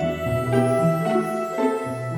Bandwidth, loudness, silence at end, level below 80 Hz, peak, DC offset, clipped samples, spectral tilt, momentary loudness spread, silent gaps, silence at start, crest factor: 17.5 kHz; -22 LUFS; 0 s; -48 dBFS; -6 dBFS; under 0.1%; under 0.1%; -7 dB/octave; 5 LU; none; 0 s; 16 dB